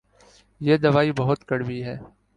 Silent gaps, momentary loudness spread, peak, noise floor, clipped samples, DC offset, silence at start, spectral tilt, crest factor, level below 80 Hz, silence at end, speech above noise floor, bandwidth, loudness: none; 14 LU; -4 dBFS; -56 dBFS; under 0.1%; under 0.1%; 0.6 s; -8 dB/octave; 18 dB; -56 dBFS; 0.3 s; 34 dB; 9.8 kHz; -22 LUFS